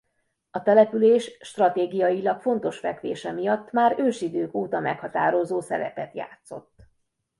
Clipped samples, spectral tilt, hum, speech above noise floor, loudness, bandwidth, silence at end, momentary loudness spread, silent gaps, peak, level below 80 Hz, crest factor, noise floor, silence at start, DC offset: under 0.1%; -6 dB/octave; none; 51 dB; -24 LUFS; 11.5 kHz; 0.8 s; 17 LU; none; -4 dBFS; -68 dBFS; 20 dB; -75 dBFS; 0.55 s; under 0.1%